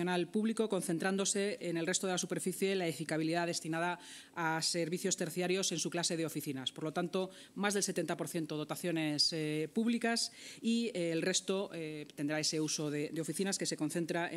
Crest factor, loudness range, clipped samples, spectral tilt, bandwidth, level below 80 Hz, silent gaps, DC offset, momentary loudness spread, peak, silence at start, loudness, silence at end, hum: 18 dB; 2 LU; under 0.1%; -3.5 dB/octave; 16 kHz; -86 dBFS; none; under 0.1%; 6 LU; -18 dBFS; 0 s; -35 LUFS; 0 s; none